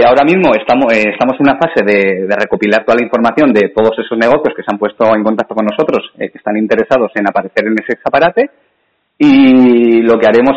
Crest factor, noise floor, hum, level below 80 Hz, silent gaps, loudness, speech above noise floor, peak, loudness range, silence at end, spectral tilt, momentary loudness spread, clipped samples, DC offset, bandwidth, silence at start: 10 dB; -61 dBFS; none; -48 dBFS; none; -10 LUFS; 51 dB; 0 dBFS; 3 LU; 0 s; -7 dB/octave; 8 LU; under 0.1%; under 0.1%; 8 kHz; 0 s